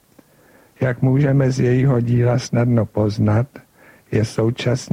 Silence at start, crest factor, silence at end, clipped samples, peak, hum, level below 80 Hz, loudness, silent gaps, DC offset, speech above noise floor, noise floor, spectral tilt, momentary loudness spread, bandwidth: 0.8 s; 12 dB; 0 s; under 0.1%; -6 dBFS; none; -46 dBFS; -18 LUFS; none; under 0.1%; 35 dB; -52 dBFS; -7.5 dB/octave; 6 LU; 10.5 kHz